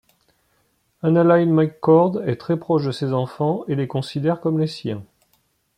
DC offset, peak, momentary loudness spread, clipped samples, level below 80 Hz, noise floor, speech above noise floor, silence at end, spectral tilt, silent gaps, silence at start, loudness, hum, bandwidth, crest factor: under 0.1%; -4 dBFS; 10 LU; under 0.1%; -62 dBFS; -65 dBFS; 46 dB; 0.75 s; -8.5 dB/octave; none; 1.05 s; -20 LUFS; none; 10.5 kHz; 18 dB